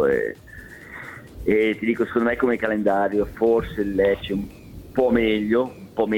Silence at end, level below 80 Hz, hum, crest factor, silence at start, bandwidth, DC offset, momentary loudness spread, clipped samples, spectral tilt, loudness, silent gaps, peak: 0 s; -44 dBFS; none; 14 dB; 0 s; 17.5 kHz; under 0.1%; 17 LU; under 0.1%; -7 dB/octave; -22 LUFS; none; -8 dBFS